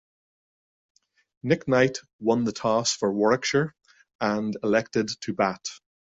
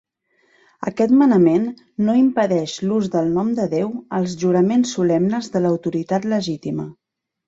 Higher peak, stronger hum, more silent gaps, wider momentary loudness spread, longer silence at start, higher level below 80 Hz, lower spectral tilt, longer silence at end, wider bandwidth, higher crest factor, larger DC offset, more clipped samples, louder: second, -8 dBFS vs -4 dBFS; neither; first, 2.13-2.19 s, 4.15-4.19 s vs none; second, 8 LU vs 11 LU; first, 1.45 s vs 0.8 s; about the same, -64 dBFS vs -60 dBFS; second, -4.5 dB/octave vs -7 dB/octave; second, 0.35 s vs 0.55 s; about the same, 8 kHz vs 8 kHz; first, 20 dB vs 14 dB; neither; neither; second, -25 LUFS vs -19 LUFS